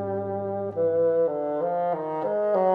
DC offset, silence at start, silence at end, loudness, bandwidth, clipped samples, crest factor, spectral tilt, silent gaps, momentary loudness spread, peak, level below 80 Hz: under 0.1%; 0 s; 0 s; -26 LUFS; 4 kHz; under 0.1%; 12 dB; -10 dB/octave; none; 7 LU; -12 dBFS; -68 dBFS